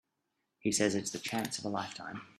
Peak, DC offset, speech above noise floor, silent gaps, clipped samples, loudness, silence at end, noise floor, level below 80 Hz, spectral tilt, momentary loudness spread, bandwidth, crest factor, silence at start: -14 dBFS; under 0.1%; 48 dB; none; under 0.1%; -34 LUFS; 0.1 s; -83 dBFS; -72 dBFS; -3.5 dB/octave; 9 LU; 15 kHz; 22 dB; 0.65 s